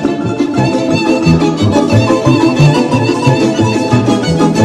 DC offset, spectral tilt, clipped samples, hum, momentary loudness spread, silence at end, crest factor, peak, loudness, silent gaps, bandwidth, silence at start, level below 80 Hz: under 0.1%; -6.5 dB/octave; 0.2%; none; 4 LU; 0 s; 10 dB; 0 dBFS; -11 LUFS; none; 12.5 kHz; 0 s; -36 dBFS